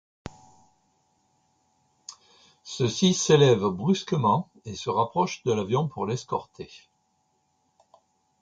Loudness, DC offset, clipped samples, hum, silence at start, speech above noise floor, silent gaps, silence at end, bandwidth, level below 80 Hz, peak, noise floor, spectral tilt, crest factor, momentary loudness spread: -24 LUFS; under 0.1%; under 0.1%; none; 0.25 s; 47 dB; none; 1.65 s; 9.4 kHz; -62 dBFS; -6 dBFS; -71 dBFS; -5 dB/octave; 20 dB; 26 LU